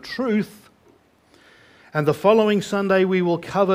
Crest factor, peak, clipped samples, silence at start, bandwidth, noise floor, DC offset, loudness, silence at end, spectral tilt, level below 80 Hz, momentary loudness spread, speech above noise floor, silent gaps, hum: 18 dB; -2 dBFS; under 0.1%; 0.05 s; 16 kHz; -56 dBFS; under 0.1%; -20 LUFS; 0 s; -6.5 dB/octave; -60 dBFS; 7 LU; 37 dB; none; none